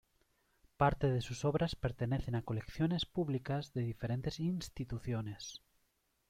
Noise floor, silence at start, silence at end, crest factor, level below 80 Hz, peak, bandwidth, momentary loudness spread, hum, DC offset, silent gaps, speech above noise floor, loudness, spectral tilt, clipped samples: -79 dBFS; 0.8 s; 0.7 s; 20 dB; -54 dBFS; -18 dBFS; 14.5 kHz; 9 LU; none; under 0.1%; none; 42 dB; -37 LUFS; -6.5 dB/octave; under 0.1%